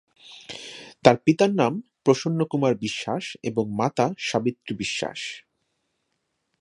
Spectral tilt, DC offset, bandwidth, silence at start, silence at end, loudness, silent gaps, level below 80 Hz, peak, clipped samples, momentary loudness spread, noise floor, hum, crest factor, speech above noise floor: -5.5 dB/octave; under 0.1%; 11 kHz; 0.25 s; 1.2 s; -24 LUFS; none; -64 dBFS; 0 dBFS; under 0.1%; 17 LU; -76 dBFS; none; 24 dB; 53 dB